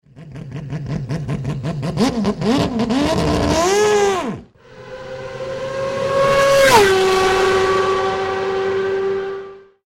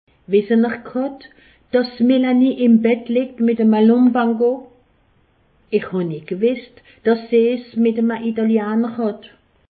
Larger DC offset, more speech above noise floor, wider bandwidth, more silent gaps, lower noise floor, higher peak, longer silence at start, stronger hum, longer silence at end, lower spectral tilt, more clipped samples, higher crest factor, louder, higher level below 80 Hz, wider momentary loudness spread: neither; second, 21 dB vs 41 dB; first, 16.5 kHz vs 4.8 kHz; neither; second, -40 dBFS vs -58 dBFS; about the same, -2 dBFS vs -4 dBFS; second, 0.15 s vs 0.3 s; neither; second, 0.25 s vs 0.45 s; second, -4.5 dB/octave vs -12 dB/octave; neither; about the same, 16 dB vs 14 dB; about the same, -17 LUFS vs -18 LUFS; first, -40 dBFS vs -62 dBFS; first, 18 LU vs 10 LU